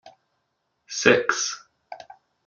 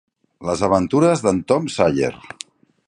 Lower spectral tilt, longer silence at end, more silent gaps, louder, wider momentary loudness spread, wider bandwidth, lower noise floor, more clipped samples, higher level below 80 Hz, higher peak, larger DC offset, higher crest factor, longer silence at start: second, -2.5 dB/octave vs -6 dB/octave; second, 0.5 s vs 0.7 s; neither; second, -22 LUFS vs -18 LUFS; first, 25 LU vs 19 LU; second, 7.6 kHz vs 11 kHz; first, -75 dBFS vs -41 dBFS; neither; second, -66 dBFS vs -48 dBFS; about the same, -2 dBFS vs -2 dBFS; neither; first, 26 dB vs 18 dB; second, 0.05 s vs 0.4 s